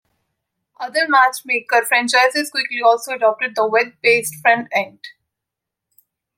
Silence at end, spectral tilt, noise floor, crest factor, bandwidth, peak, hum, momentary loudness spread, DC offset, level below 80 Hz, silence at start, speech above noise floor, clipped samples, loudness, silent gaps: 1.3 s; -1.5 dB/octave; -83 dBFS; 18 dB; 16.5 kHz; -2 dBFS; none; 8 LU; under 0.1%; -76 dBFS; 0.8 s; 66 dB; under 0.1%; -16 LUFS; none